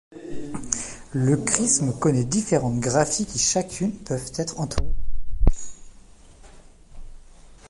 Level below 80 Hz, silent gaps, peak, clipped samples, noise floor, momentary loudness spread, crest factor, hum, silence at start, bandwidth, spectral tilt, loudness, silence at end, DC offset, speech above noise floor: -32 dBFS; none; 0 dBFS; under 0.1%; -47 dBFS; 15 LU; 22 dB; none; 0.1 s; 11.5 kHz; -4.5 dB/octave; -24 LUFS; 0 s; under 0.1%; 25 dB